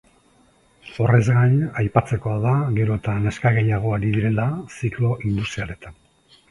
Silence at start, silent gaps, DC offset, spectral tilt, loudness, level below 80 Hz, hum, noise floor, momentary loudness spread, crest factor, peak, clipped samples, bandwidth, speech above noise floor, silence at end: 0.85 s; none; under 0.1%; -8 dB/octave; -21 LUFS; -44 dBFS; none; -57 dBFS; 10 LU; 20 dB; 0 dBFS; under 0.1%; 11.5 kHz; 37 dB; 0.6 s